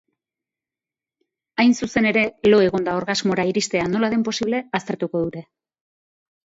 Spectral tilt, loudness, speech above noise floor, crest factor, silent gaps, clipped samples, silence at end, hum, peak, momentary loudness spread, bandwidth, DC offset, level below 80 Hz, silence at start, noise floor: -5 dB/octave; -20 LUFS; 70 dB; 18 dB; none; under 0.1%; 1.15 s; none; -4 dBFS; 9 LU; 8 kHz; under 0.1%; -56 dBFS; 1.6 s; -90 dBFS